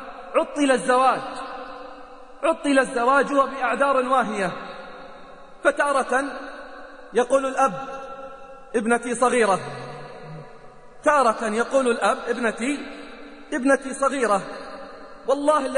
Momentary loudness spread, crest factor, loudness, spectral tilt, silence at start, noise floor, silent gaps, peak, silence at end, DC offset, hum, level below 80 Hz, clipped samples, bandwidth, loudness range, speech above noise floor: 20 LU; 16 dB; -22 LUFS; -4 dB/octave; 0 s; -44 dBFS; none; -6 dBFS; 0 s; 0.3%; none; -54 dBFS; under 0.1%; 10 kHz; 3 LU; 23 dB